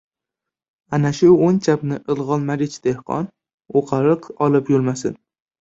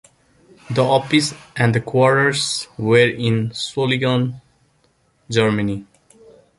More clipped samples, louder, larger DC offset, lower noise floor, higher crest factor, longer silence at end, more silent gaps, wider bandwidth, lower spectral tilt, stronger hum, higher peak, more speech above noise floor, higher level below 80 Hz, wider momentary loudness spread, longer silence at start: neither; about the same, -19 LUFS vs -18 LUFS; neither; first, -85 dBFS vs -61 dBFS; about the same, 16 dB vs 18 dB; second, 0.45 s vs 0.75 s; first, 3.54-3.58 s vs none; second, 8 kHz vs 11.5 kHz; first, -7.5 dB/octave vs -5 dB/octave; neither; about the same, -2 dBFS vs -2 dBFS; first, 68 dB vs 43 dB; about the same, -58 dBFS vs -54 dBFS; first, 12 LU vs 9 LU; first, 0.9 s vs 0.7 s